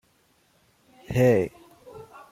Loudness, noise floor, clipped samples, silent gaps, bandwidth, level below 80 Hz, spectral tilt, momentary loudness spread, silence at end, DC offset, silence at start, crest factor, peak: -23 LUFS; -65 dBFS; under 0.1%; none; 16 kHz; -54 dBFS; -7.5 dB/octave; 26 LU; 0.3 s; under 0.1%; 1.1 s; 20 dB; -8 dBFS